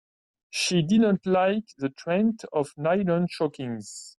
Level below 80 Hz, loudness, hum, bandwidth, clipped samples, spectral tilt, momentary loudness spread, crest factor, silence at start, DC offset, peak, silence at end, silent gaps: -64 dBFS; -25 LUFS; none; 12 kHz; under 0.1%; -5.5 dB/octave; 12 LU; 14 dB; 0.55 s; under 0.1%; -12 dBFS; 0.1 s; none